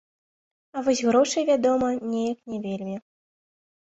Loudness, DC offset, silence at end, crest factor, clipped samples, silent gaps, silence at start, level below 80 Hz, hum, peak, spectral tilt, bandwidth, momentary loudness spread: -24 LUFS; under 0.1%; 1 s; 18 dB; under 0.1%; none; 0.75 s; -66 dBFS; none; -8 dBFS; -4.5 dB/octave; 8.2 kHz; 13 LU